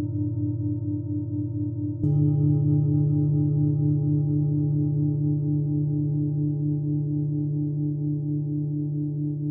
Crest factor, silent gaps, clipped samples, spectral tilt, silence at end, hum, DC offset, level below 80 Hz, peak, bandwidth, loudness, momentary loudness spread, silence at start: 12 dB; none; under 0.1%; -16 dB/octave; 0 s; none; under 0.1%; -64 dBFS; -12 dBFS; 1 kHz; -25 LUFS; 6 LU; 0 s